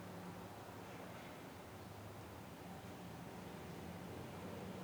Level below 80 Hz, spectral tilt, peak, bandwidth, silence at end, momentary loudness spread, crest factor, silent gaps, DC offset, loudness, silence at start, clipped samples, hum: -72 dBFS; -5.5 dB/octave; -38 dBFS; over 20 kHz; 0 s; 3 LU; 14 dB; none; under 0.1%; -52 LUFS; 0 s; under 0.1%; none